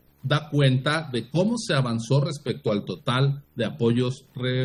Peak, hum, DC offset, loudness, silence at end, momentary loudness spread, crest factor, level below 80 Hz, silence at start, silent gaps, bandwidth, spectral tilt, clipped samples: -8 dBFS; none; under 0.1%; -25 LUFS; 0 s; 7 LU; 16 dB; -62 dBFS; 0.25 s; none; 11 kHz; -6.5 dB/octave; under 0.1%